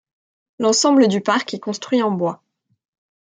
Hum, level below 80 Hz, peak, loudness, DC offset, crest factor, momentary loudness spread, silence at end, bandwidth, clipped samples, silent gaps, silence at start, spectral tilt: none; -70 dBFS; -2 dBFS; -18 LUFS; under 0.1%; 18 dB; 12 LU; 1 s; 9.6 kHz; under 0.1%; none; 0.6 s; -4 dB/octave